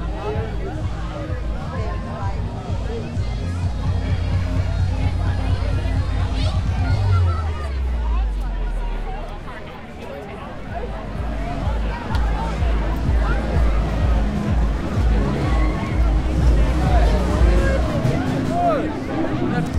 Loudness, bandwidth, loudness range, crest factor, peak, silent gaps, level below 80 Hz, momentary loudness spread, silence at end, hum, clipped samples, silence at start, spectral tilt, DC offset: -22 LUFS; 10 kHz; 8 LU; 16 dB; -4 dBFS; none; -22 dBFS; 11 LU; 0 s; none; under 0.1%; 0 s; -7.5 dB/octave; under 0.1%